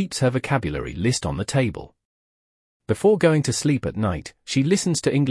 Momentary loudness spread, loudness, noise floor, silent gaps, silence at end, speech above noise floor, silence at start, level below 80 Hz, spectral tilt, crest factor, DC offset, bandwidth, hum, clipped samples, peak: 8 LU; -22 LUFS; under -90 dBFS; 2.05-2.80 s; 0 s; over 69 dB; 0 s; -46 dBFS; -5.5 dB/octave; 16 dB; under 0.1%; 12 kHz; none; under 0.1%; -6 dBFS